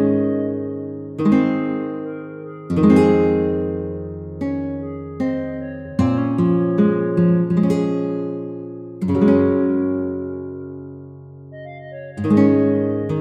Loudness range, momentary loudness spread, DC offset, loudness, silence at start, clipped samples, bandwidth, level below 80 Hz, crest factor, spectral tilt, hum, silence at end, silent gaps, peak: 3 LU; 18 LU; under 0.1%; -19 LUFS; 0 s; under 0.1%; 9.4 kHz; -48 dBFS; 16 dB; -9.5 dB/octave; none; 0 s; none; -2 dBFS